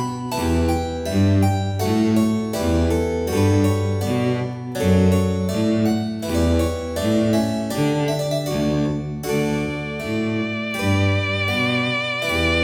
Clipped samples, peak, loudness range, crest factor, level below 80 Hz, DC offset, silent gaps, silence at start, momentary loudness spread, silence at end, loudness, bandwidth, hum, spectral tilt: under 0.1%; -6 dBFS; 2 LU; 14 dB; -40 dBFS; under 0.1%; none; 0 s; 6 LU; 0 s; -21 LUFS; 18 kHz; none; -6 dB/octave